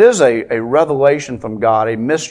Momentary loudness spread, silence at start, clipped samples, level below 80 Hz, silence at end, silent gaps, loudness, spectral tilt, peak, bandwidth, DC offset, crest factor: 7 LU; 0 s; 0.1%; -52 dBFS; 0 s; none; -14 LUFS; -5 dB/octave; 0 dBFS; 10.5 kHz; under 0.1%; 14 dB